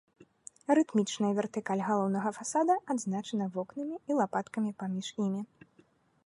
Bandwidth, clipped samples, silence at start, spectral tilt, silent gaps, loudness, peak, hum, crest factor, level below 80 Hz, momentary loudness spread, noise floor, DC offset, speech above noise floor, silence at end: 11.5 kHz; under 0.1%; 0.7 s; -5.5 dB/octave; none; -32 LUFS; -12 dBFS; none; 20 dB; -80 dBFS; 10 LU; -66 dBFS; under 0.1%; 35 dB; 0.8 s